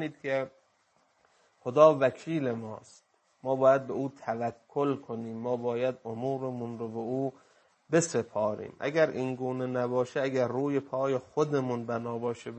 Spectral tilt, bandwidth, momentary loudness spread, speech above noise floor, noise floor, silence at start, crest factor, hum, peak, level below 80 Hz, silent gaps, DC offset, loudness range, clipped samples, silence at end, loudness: -6 dB/octave; 8.8 kHz; 12 LU; 40 dB; -70 dBFS; 0 s; 24 dB; none; -6 dBFS; -76 dBFS; none; under 0.1%; 5 LU; under 0.1%; 0 s; -30 LUFS